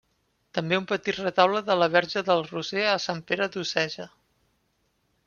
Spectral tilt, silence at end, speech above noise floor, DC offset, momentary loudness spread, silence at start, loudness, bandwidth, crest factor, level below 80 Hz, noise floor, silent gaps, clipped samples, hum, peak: -4.5 dB/octave; 1.2 s; 46 dB; under 0.1%; 9 LU; 0.55 s; -25 LUFS; 7.2 kHz; 22 dB; -68 dBFS; -72 dBFS; none; under 0.1%; none; -4 dBFS